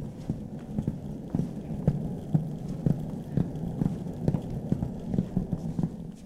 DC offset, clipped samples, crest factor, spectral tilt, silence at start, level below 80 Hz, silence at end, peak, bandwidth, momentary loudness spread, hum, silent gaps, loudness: under 0.1%; under 0.1%; 20 dB; -9.5 dB/octave; 0 s; -44 dBFS; 0 s; -10 dBFS; 12.5 kHz; 6 LU; none; none; -32 LUFS